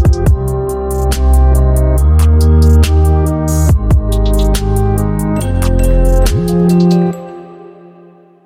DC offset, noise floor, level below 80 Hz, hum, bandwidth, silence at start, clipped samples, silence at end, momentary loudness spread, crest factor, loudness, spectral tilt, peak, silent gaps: under 0.1%; -41 dBFS; -12 dBFS; none; 16 kHz; 0 s; under 0.1%; 0.8 s; 7 LU; 10 dB; -12 LUFS; -7 dB/octave; 0 dBFS; none